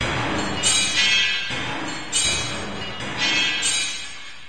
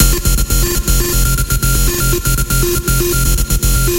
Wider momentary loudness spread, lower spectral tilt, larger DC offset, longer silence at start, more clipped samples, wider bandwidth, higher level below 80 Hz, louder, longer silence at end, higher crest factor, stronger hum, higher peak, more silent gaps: first, 12 LU vs 1 LU; second, -1 dB/octave vs -3.5 dB/octave; first, 2% vs under 0.1%; about the same, 0 s vs 0 s; neither; second, 11 kHz vs 17.5 kHz; second, -46 dBFS vs -16 dBFS; second, -20 LUFS vs -14 LUFS; about the same, 0 s vs 0 s; first, 18 dB vs 12 dB; neither; second, -6 dBFS vs 0 dBFS; neither